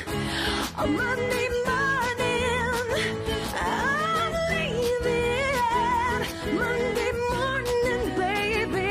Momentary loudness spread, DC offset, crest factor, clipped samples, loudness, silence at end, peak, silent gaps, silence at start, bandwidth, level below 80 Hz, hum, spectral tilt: 3 LU; under 0.1%; 12 dB; under 0.1%; -25 LUFS; 0 s; -12 dBFS; none; 0 s; 16 kHz; -42 dBFS; none; -4.5 dB/octave